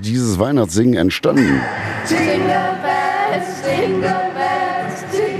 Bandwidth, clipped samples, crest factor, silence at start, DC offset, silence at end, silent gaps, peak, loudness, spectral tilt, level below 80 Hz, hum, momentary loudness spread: 14 kHz; under 0.1%; 16 dB; 0 s; under 0.1%; 0 s; none; 0 dBFS; -17 LUFS; -5.5 dB/octave; -46 dBFS; none; 6 LU